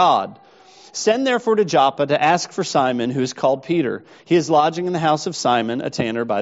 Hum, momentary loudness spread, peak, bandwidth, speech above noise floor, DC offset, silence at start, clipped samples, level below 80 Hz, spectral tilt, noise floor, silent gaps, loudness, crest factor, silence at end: none; 6 LU; -2 dBFS; 8 kHz; 28 dB; under 0.1%; 0 s; under 0.1%; -64 dBFS; -4 dB/octave; -47 dBFS; none; -19 LUFS; 18 dB; 0 s